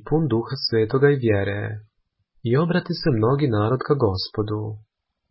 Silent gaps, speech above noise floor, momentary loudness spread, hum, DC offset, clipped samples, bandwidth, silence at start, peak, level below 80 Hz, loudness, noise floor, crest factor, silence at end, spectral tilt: none; 46 dB; 13 LU; none; under 0.1%; under 0.1%; 5.8 kHz; 0.05 s; -4 dBFS; -46 dBFS; -22 LUFS; -67 dBFS; 18 dB; 0.5 s; -11 dB/octave